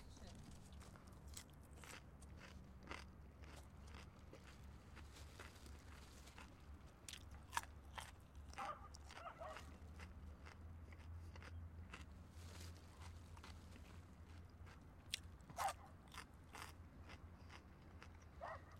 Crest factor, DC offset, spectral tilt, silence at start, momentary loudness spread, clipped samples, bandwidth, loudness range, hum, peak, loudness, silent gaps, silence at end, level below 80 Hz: 32 dB; under 0.1%; -4 dB/octave; 0 s; 11 LU; under 0.1%; 16 kHz; 6 LU; none; -24 dBFS; -57 LUFS; none; 0 s; -64 dBFS